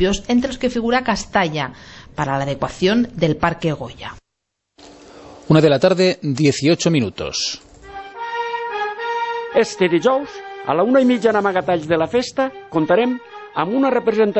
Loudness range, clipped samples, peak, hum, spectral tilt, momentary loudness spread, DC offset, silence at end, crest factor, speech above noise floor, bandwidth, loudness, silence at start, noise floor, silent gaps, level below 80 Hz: 4 LU; under 0.1%; -2 dBFS; none; -5.5 dB/octave; 14 LU; under 0.1%; 0 s; 16 dB; 60 dB; 8.4 kHz; -18 LUFS; 0 s; -77 dBFS; none; -44 dBFS